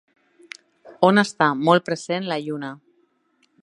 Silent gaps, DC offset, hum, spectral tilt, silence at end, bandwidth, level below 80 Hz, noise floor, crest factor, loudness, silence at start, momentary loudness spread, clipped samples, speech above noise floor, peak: none; under 0.1%; none; -5.5 dB/octave; 0.85 s; 11.5 kHz; -72 dBFS; -66 dBFS; 22 dB; -20 LUFS; 0.85 s; 24 LU; under 0.1%; 46 dB; 0 dBFS